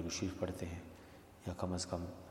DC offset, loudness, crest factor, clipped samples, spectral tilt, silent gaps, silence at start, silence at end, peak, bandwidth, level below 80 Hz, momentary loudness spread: under 0.1%; -43 LUFS; 20 dB; under 0.1%; -5 dB/octave; none; 0 s; 0 s; -22 dBFS; 16.5 kHz; -64 dBFS; 16 LU